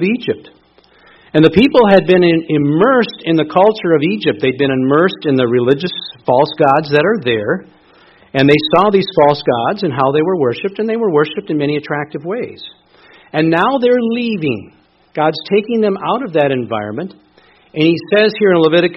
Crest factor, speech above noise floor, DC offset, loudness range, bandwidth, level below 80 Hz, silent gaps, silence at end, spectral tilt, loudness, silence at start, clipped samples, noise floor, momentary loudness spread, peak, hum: 14 dB; 36 dB; under 0.1%; 5 LU; 6 kHz; -50 dBFS; none; 0 s; -8.5 dB/octave; -13 LUFS; 0 s; under 0.1%; -49 dBFS; 11 LU; 0 dBFS; none